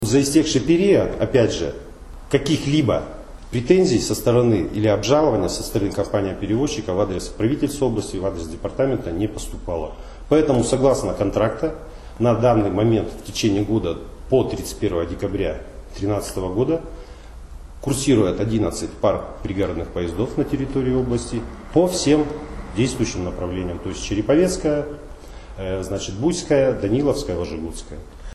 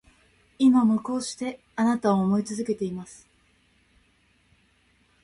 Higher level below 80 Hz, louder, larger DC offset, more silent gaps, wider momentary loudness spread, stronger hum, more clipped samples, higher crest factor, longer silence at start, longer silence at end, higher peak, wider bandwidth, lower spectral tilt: first, -36 dBFS vs -64 dBFS; first, -21 LUFS vs -24 LUFS; neither; neither; about the same, 14 LU vs 14 LU; neither; neither; about the same, 18 dB vs 16 dB; second, 0 s vs 0.6 s; second, 0 s vs 2.1 s; first, -2 dBFS vs -10 dBFS; first, 13 kHz vs 11.5 kHz; about the same, -6 dB/octave vs -6 dB/octave